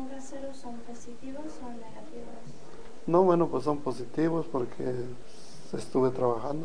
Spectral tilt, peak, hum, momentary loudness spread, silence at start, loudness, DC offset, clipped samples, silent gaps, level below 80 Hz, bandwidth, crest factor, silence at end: -7.5 dB/octave; -10 dBFS; none; 23 LU; 0 s; -30 LUFS; 2%; under 0.1%; none; -58 dBFS; 10 kHz; 22 dB; 0 s